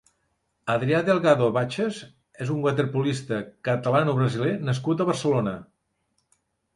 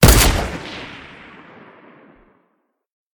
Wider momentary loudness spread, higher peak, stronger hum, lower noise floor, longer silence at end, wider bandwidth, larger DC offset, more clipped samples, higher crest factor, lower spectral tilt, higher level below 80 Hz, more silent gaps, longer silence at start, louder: second, 10 LU vs 28 LU; second, -6 dBFS vs 0 dBFS; neither; first, -73 dBFS vs -68 dBFS; second, 1.1 s vs 2.2 s; second, 11.5 kHz vs 18 kHz; neither; neither; about the same, 20 dB vs 20 dB; first, -6.5 dB/octave vs -4 dB/octave; second, -62 dBFS vs -24 dBFS; neither; first, 0.65 s vs 0 s; second, -24 LUFS vs -17 LUFS